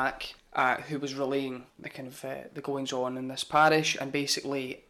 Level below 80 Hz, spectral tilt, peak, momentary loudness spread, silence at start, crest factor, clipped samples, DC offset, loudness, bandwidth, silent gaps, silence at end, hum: -64 dBFS; -3.5 dB/octave; -10 dBFS; 17 LU; 0 s; 20 dB; under 0.1%; under 0.1%; -29 LUFS; 19 kHz; none; 0.1 s; none